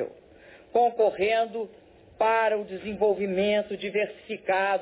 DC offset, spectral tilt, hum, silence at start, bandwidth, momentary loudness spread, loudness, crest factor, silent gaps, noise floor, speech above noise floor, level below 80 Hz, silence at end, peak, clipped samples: under 0.1%; -8.5 dB/octave; none; 0 s; 4 kHz; 11 LU; -26 LUFS; 14 dB; none; -52 dBFS; 26 dB; -62 dBFS; 0 s; -12 dBFS; under 0.1%